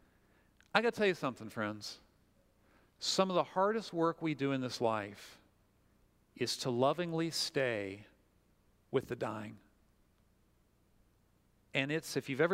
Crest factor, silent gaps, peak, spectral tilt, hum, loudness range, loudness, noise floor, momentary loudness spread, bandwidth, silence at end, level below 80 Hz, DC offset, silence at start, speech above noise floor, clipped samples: 28 dB; none; -10 dBFS; -4.5 dB/octave; none; 9 LU; -35 LUFS; -71 dBFS; 13 LU; 16 kHz; 0 s; -74 dBFS; under 0.1%; 0.75 s; 36 dB; under 0.1%